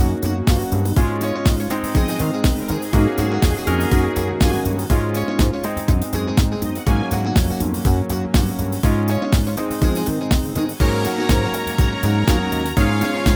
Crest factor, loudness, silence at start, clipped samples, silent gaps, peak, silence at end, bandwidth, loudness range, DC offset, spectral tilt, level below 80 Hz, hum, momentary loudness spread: 14 dB; -19 LUFS; 0 s; under 0.1%; none; -4 dBFS; 0 s; over 20 kHz; 1 LU; under 0.1%; -6 dB/octave; -24 dBFS; none; 3 LU